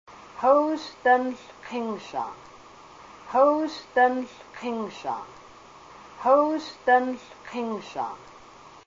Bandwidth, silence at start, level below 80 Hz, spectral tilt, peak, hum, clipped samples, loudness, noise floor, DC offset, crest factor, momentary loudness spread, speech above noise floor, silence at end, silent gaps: 7.6 kHz; 0.1 s; -66 dBFS; -4.5 dB/octave; -8 dBFS; none; under 0.1%; -25 LUFS; -49 dBFS; under 0.1%; 20 dB; 18 LU; 24 dB; 0.2 s; none